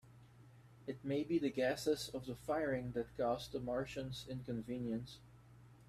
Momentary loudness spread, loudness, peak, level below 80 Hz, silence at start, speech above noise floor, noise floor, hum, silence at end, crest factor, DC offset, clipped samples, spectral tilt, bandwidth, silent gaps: 10 LU; -41 LUFS; -24 dBFS; -66 dBFS; 0.05 s; 22 dB; -62 dBFS; none; 0.05 s; 18 dB; under 0.1%; under 0.1%; -5.5 dB/octave; 15.5 kHz; none